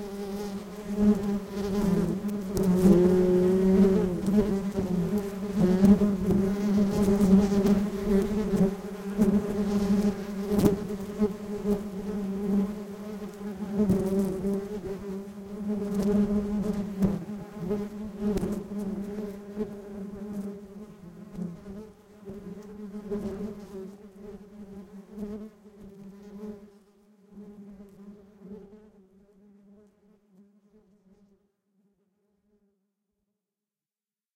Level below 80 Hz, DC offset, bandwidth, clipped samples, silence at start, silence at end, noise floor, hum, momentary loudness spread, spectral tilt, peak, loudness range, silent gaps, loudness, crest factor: -46 dBFS; under 0.1%; 16.5 kHz; under 0.1%; 0 s; 5.6 s; under -90 dBFS; none; 24 LU; -8 dB/octave; -6 dBFS; 20 LU; none; -27 LUFS; 22 dB